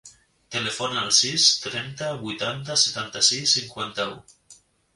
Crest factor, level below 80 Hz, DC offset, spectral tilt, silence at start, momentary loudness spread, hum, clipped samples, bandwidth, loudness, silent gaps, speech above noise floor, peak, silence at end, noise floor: 24 dB; -64 dBFS; under 0.1%; -1 dB/octave; 0.05 s; 13 LU; none; under 0.1%; 11.5 kHz; -22 LUFS; none; 30 dB; -2 dBFS; 0.4 s; -54 dBFS